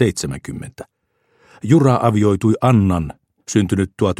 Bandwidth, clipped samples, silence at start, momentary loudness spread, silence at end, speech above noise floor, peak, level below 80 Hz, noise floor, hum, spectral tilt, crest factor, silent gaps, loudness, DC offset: 13.5 kHz; under 0.1%; 0 s; 17 LU; 0.05 s; 45 dB; 0 dBFS; -44 dBFS; -61 dBFS; none; -7 dB/octave; 16 dB; none; -16 LUFS; under 0.1%